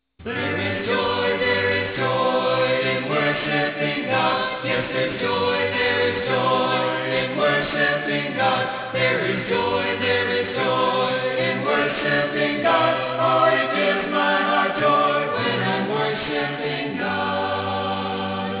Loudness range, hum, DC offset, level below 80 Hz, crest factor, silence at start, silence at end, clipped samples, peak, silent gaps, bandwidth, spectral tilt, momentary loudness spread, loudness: 2 LU; none; under 0.1%; -52 dBFS; 16 dB; 0.2 s; 0 s; under 0.1%; -6 dBFS; none; 4 kHz; -8.5 dB/octave; 5 LU; -21 LUFS